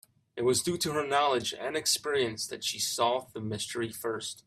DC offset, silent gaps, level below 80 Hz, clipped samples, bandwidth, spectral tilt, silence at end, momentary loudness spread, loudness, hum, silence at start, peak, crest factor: under 0.1%; none; -68 dBFS; under 0.1%; 16 kHz; -2.5 dB/octave; 0.05 s; 8 LU; -30 LUFS; none; 0.35 s; -12 dBFS; 18 dB